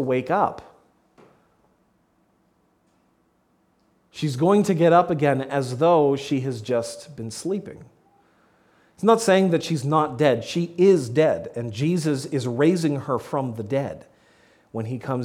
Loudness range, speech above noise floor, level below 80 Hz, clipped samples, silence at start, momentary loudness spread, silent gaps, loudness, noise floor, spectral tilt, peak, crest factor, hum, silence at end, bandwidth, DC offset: 7 LU; 44 dB; -64 dBFS; under 0.1%; 0 s; 14 LU; none; -22 LUFS; -65 dBFS; -6.5 dB/octave; -4 dBFS; 20 dB; none; 0 s; 15.5 kHz; under 0.1%